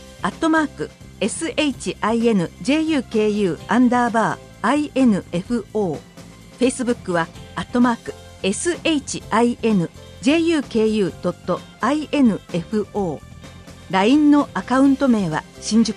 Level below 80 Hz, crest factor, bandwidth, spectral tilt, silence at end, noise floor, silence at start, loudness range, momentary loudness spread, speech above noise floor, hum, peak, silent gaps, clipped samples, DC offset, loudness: -48 dBFS; 14 dB; 11.5 kHz; -5 dB/octave; 0 s; -41 dBFS; 0 s; 3 LU; 10 LU; 22 dB; none; -6 dBFS; none; under 0.1%; under 0.1%; -20 LUFS